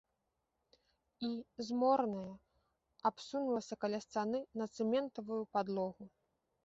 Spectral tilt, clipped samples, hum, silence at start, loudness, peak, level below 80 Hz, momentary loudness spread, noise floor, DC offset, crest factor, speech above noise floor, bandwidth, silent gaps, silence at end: -5 dB/octave; under 0.1%; none; 1.2 s; -38 LUFS; -20 dBFS; -78 dBFS; 11 LU; -85 dBFS; under 0.1%; 20 dB; 48 dB; 8 kHz; none; 0.55 s